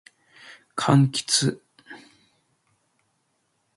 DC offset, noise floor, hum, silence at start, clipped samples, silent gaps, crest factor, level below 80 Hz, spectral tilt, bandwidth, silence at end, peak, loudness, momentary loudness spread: under 0.1%; -72 dBFS; none; 0.75 s; under 0.1%; none; 22 dB; -66 dBFS; -4.5 dB/octave; 11.5 kHz; 1.8 s; -6 dBFS; -22 LUFS; 26 LU